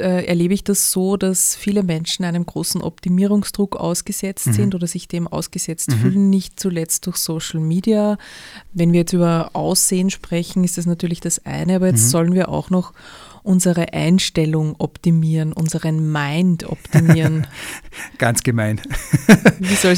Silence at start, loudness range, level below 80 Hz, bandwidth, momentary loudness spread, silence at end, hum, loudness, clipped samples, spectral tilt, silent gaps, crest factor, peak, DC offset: 0 s; 2 LU; -44 dBFS; 16.5 kHz; 9 LU; 0 s; none; -18 LUFS; under 0.1%; -5 dB/octave; none; 18 dB; 0 dBFS; under 0.1%